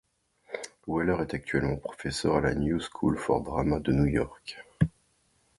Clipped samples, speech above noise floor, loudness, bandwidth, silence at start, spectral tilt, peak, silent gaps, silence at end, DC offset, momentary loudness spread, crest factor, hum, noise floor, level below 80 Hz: under 0.1%; 41 dB; -29 LUFS; 11.5 kHz; 0.5 s; -6.5 dB/octave; -8 dBFS; none; 0.7 s; under 0.1%; 13 LU; 20 dB; none; -69 dBFS; -44 dBFS